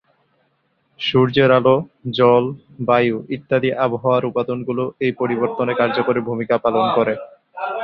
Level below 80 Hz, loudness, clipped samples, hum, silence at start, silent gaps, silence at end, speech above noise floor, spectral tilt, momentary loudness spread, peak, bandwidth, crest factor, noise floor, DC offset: -58 dBFS; -18 LUFS; under 0.1%; none; 1 s; none; 0 s; 47 dB; -8.5 dB/octave; 11 LU; 0 dBFS; 6 kHz; 18 dB; -65 dBFS; under 0.1%